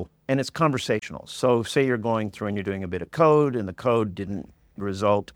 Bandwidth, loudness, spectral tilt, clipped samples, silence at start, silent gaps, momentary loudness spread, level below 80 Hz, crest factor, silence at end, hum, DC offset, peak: 16 kHz; -24 LUFS; -6 dB/octave; under 0.1%; 0 s; none; 13 LU; -56 dBFS; 20 dB; 0.1 s; none; under 0.1%; -6 dBFS